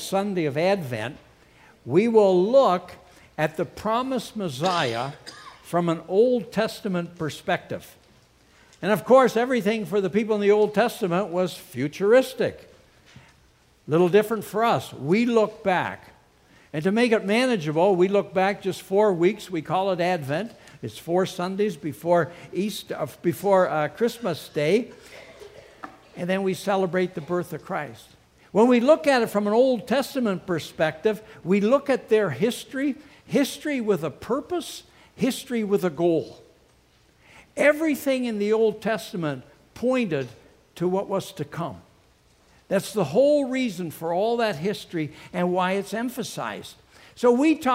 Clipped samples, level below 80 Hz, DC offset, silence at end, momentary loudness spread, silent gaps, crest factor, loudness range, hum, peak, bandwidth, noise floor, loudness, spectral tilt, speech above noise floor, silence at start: under 0.1%; -62 dBFS; under 0.1%; 0 s; 13 LU; none; 20 dB; 5 LU; none; -4 dBFS; 16 kHz; -59 dBFS; -24 LUFS; -6 dB/octave; 36 dB; 0 s